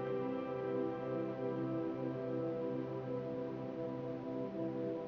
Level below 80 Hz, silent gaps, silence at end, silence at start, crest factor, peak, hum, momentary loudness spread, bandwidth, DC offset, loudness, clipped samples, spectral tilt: -72 dBFS; none; 0 s; 0 s; 12 dB; -28 dBFS; none; 3 LU; 6.4 kHz; under 0.1%; -40 LUFS; under 0.1%; -9.5 dB/octave